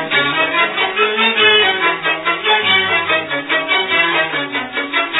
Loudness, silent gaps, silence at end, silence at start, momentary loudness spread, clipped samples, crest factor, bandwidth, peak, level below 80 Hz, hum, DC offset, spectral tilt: -13 LUFS; none; 0 s; 0 s; 7 LU; under 0.1%; 16 dB; 4.1 kHz; 0 dBFS; -58 dBFS; none; under 0.1%; -5.5 dB/octave